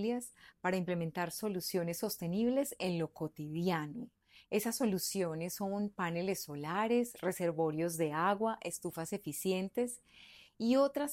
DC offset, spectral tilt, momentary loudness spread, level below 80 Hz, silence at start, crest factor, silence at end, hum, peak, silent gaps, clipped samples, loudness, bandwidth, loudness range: under 0.1%; -5 dB/octave; 8 LU; -72 dBFS; 0 s; 18 dB; 0 s; none; -18 dBFS; none; under 0.1%; -36 LUFS; 16.5 kHz; 2 LU